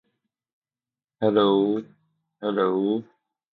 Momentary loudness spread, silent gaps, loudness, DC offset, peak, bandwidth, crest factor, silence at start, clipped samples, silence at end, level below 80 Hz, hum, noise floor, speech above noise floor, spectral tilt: 11 LU; none; -24 LUFS; under 0.1%; -6 dBFS; 4.4 kHz; 20 dB; 1.2 s; under 0.1%; 0.55 s; -72 dBFS; none; under -90 dBFS; over 68 dB; -9.5 dB/octave